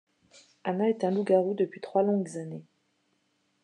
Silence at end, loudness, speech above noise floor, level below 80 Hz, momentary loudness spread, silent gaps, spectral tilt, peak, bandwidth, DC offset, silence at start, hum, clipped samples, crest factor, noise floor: 1 s; -28 LUFS; 46 dB; -88 dBFS; 14 LU; none; -7.5 dB/octave; -10 dBFS; 10 kHz; under 0.1%; 0.65 s; none; under 0.1%; 20 dB; -73 dBFS